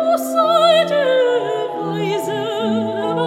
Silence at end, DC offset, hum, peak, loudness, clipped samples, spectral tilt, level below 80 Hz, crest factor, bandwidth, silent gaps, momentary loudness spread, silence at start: 0 s; under 0.1%; none; -2 dBFS; -17 LUFS; under 0.1%; -5 dB/octave; -70 dBFS; 14 dB; 16.5 kHz; none; 9 LU; 0 s